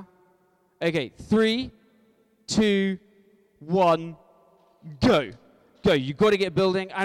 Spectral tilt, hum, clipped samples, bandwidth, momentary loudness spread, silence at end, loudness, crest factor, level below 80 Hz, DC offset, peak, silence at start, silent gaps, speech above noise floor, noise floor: -5.5 dB/octave; none; under 0.1%; 13 kHz; 12 LU; 0 s; -24 LUFS; 16 dB; -54 dBFS; under 0.1%; -8 dBFS; 0 s; none; 41 dB; -64 dBFS